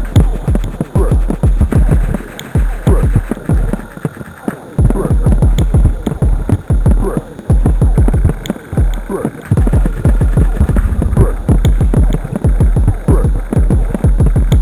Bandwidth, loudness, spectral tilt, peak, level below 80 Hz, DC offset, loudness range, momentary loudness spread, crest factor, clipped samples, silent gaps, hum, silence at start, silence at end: 12.5 kHz; -14 LUFS; -8 dB/octave; 0 dBFS; -14 dBFS; under 0.1%; 2 LU; 8 LU; 10 dB; under 0.1%; none; none; 0 s; 0 s